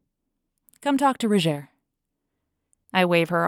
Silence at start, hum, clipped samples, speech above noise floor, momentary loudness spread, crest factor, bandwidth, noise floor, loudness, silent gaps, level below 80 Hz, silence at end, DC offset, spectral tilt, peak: 0.85 s; none; under 0.1%; 59 dB; 8 LU; 20 dB; 17 kHz; -80 dBFS; -23 LUFS; none; -72 dBFS; 0 s; under 0.1%; -5.5 dB/octave; -6 dBFS